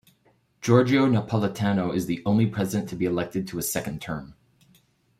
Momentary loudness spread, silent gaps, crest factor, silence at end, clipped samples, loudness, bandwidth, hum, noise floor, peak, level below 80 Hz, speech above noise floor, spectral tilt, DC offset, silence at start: 12 LU; none; 20 dB; 0.9 s; under 0.1%; -25 LUFS; 16 kHz; none; -64 dBFS; -6 dBFS; -56 dBFS; 40 dB; -6 dB/octave; under 0.1%; 0.6 s